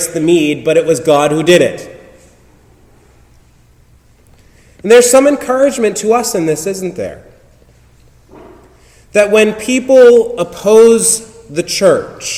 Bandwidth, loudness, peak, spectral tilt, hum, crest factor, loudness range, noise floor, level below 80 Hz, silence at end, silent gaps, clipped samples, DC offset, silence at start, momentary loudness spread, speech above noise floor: 16 kHz; -10 LUFS; 0 dBFS; -3.5 dB/octave; none; 12 dB; 8 LU; -46 dBFS; -48 dBFS; 0 s; none; 1%; under 0.1%; 0 s; 14 LU; 36 dB